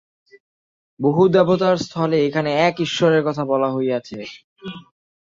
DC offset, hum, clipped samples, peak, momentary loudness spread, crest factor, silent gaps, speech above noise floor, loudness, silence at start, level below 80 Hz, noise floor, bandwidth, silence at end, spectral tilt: under 0.1%; none; under 0.1%; -2 dBFS; 20 LU; 18 dB; 4.44-4.56 s; over 72 dB; -18 LUFS; 1 s; -62 dBFS; under -90 dBFS; 7.6 kHz; 0.5 s; -6.5 dB/octave